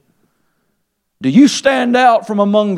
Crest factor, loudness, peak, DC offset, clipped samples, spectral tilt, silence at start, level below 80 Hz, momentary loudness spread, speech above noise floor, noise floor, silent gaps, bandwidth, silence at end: 14 dB; -12 LUFS; 0 dBFS; under 0.1%; under 0.1%; -5 dB/octave; 1.2 s; -60 dBFS; 4 LU; 57 dB; -68 dBFS; none; 12 kHz; 0 s